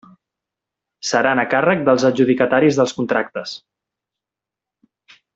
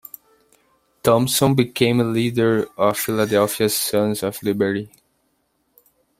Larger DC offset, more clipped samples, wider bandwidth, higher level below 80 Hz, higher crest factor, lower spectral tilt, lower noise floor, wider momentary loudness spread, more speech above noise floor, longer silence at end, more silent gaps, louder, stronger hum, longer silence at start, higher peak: neither; neither; second, 8 kHz vs 16 kHz; second, -62 dBFS vs -56 dBFS; about the same, 18 dB vs 20 dB; about the same, -5 dB/octave vs -5 dB/octave; first, -87 dBFS vs -67 dBFS; first, 13 LU vs 6 LU; first, 70 dB vs 49 dB; first, 1.8 s vs 1.3 s; neither; about the same, -17 LUFS vs -19 LUFS; neither; about the same, 1.05 s vs 1.05 s; about the same, -2 dBFS vs -2 dBFS